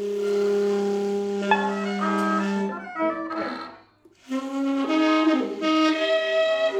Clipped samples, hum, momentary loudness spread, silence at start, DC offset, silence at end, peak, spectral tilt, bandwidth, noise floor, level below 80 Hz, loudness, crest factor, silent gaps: under 0.1%; none; 9 LU; 0 s; under 0.1%; 0 s; -6 dBFS; -5.5 dB/octave; 12 kHz; -54 dBFS; -70 dBFS; -24 LUFS; 18 dB; none